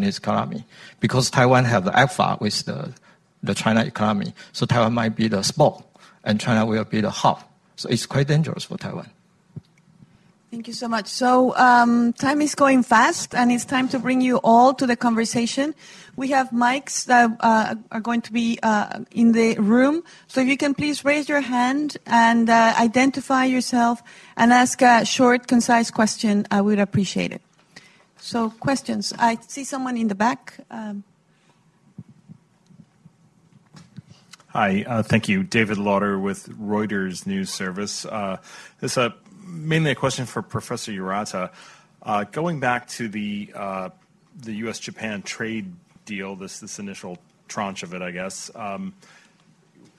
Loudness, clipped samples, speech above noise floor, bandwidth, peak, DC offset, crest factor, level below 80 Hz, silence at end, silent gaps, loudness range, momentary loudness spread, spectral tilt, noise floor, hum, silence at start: -21 LUFS; under 0.1%; 39 dB; 12.5 kHz; -4 dBFS; under 0.1%; 18 dB; -58 dBFS; 1.1 s; none; 13 LU; 16 LU; -5 dB/octave; -59 dBFS; none; 0 s